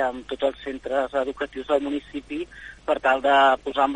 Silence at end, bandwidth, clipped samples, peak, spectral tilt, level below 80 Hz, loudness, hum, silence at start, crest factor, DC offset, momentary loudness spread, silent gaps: 0 s; 10 kHz; under 0.1%; -6 dBFS; -4 dB/octave; -52 dBFS; -24 LUFS; none; 0 s; 18 dB; under 0.1%; 15 LU; none